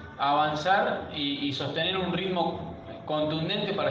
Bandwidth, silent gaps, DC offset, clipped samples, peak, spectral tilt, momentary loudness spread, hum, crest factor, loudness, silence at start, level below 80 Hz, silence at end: 7.8 kHz; none; under 0.1%; under 0.1%; -10 dBFS; -6 dB/octave; 7 LU; none; 18 dB; -28 LUFS; 0 s; -58 dBFS; 0 s